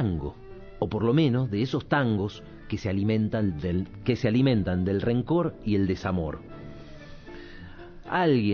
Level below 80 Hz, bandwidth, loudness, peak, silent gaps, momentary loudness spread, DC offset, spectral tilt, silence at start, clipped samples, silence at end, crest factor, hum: -46 dBFS; 6.8 kHz; -26 LUFS; -10 dBFS; none; 22 LU; under 0.1%; -8.5 dB/octave; 0 s; under 0.1%; 0 s; 16 dB; none